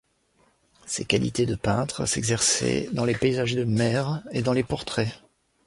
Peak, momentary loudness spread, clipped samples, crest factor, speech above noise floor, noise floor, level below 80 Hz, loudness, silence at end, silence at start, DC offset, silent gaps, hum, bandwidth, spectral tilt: -6 dBFS; 7 LU; under 0.1%; 20 dB; 40 dB; -65 dBFS; -50 dBFS; -25 LUFS; 0.5 s; 0.85 s; under 0.1%; none; none; 11.5 kHz; -4.5 dB/octave